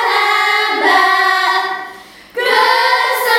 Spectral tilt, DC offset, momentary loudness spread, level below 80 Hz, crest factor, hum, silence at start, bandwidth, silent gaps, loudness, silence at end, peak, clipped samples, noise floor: 0 dB/octave; under 0.1%; 12 LU; -62 dBFS; 14 dB; none; 0 s; 17 kHz; none; -12 LUFS; 0 s; 0 dBFS; under 0.1%; -36 dBFS